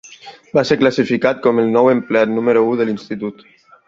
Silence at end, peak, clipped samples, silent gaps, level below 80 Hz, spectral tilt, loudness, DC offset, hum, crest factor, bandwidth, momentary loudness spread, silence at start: 0.55 s; -2 dBFS; under 0.1%; none; -56 dBFS; -6.5 dB/octave; -16 LUFS; under 0.1%; none; 14 dB; 7.6 kHz; 10 LU; 0.05 s